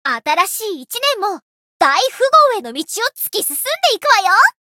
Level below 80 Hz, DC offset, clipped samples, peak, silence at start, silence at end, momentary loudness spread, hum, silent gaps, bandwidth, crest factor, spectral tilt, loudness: -72 dBFS; under 0.1%; under 0.1%; 0 dBFS; 0.05 s; 0.2 s; 12 LU; none; 1.42-1.80 s; 17.5 kHz; 16 dB; 1 dB/octave; -15 LUFS